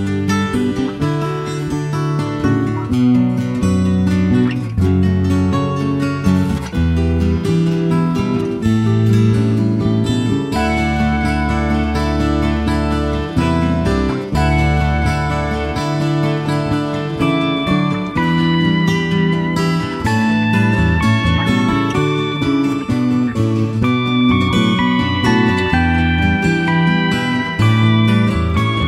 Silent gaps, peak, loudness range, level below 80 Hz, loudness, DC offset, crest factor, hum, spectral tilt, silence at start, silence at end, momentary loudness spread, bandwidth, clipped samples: none; -2 dBFS; 3 LU; -28 dBFS; -16 LUFS; under 0.1%; 12 dB; none; -7 dB/octave; 0 s; 0 s; 4 LU; 13 kHz; under 0.1%